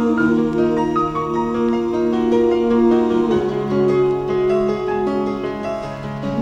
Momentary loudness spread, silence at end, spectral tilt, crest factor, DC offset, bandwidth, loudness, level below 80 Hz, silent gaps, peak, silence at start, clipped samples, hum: 8 LU; 0 s; -8 dB/octave; 12 dB; under 0.1%; 7.8 kHz; -18 LUFS; -42 dBFS; none; -4 dBFS; 0 s; under 0.1%; none